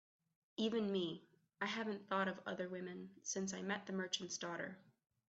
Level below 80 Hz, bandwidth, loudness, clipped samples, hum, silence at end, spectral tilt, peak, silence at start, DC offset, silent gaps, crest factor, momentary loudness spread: -86 dBFS; 8.2 kHz; -43 LUFS; under 0.1%; none; 0.5 s; -3.5 dB/octave; -24 dBFS; 0.6 s; under 0.1%; none; 20 dB; 10 LU